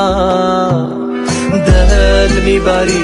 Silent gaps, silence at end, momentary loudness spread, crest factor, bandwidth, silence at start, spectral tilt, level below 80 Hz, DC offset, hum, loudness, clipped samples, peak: none; 0 s; 6 LU; 10 dB; 11.5 kHz; 0 s; -5.5 dB/octave; -16 dBFS; under 0.1%; none; -12 LUFS; under 0.1%; 0 dBFS